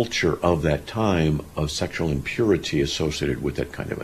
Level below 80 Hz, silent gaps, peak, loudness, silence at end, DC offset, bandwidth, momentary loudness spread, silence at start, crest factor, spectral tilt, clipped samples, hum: -38 dBFS; none; -4 dBFS; -24 LUFS; 0 s; under 0.1%; 14.5 kHz; 6 LU; 0 s; 18 dB; -5.5 dB/octave; under 0.1%; none